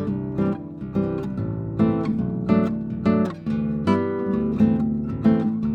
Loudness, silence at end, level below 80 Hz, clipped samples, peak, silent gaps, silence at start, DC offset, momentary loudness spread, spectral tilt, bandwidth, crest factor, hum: -23 LUFS; 0 s; -44 dBFS; under 0.1%; -6 dBFS; none; 0 s; under 0.1%; 7 LU; -10 dB/octave; 5.4 kHz; 16 dB; none